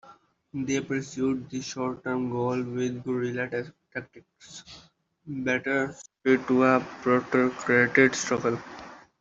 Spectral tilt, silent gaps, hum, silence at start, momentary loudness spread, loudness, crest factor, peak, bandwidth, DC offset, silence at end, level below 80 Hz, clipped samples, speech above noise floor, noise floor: -5 dB/octave; none; none; 0.05 s; 17 LU; -26 LUFS; 22 dB; -6 dBFS; 7.8 kHz; under 0.1%; 0.2 s; -66 dBFS; under 0.1%; 29 dB; -56 dBFS